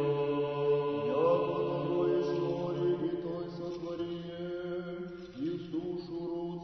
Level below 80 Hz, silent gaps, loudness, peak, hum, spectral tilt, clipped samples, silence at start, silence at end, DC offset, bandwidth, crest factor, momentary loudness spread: -64 dBFS; none; -33 LUFS; -16 dBFS; none; -8.5 dB/octave; under 0.1%; 0 s; 0 s; under 0.1%; 6.2 kHz; 16 dB; 10 LU